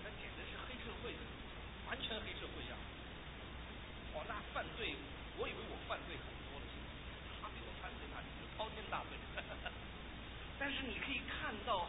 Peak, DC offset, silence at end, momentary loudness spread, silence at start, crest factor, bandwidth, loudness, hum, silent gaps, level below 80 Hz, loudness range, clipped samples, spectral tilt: -26 dBFS; under 0.1%; 0 s; 9 LU; 0 s; 20 dB; 3.9 kHz; -46 LUFS; none; none; -54 dBFS; 3 LU; under 0.1%; -1.5 dB/octave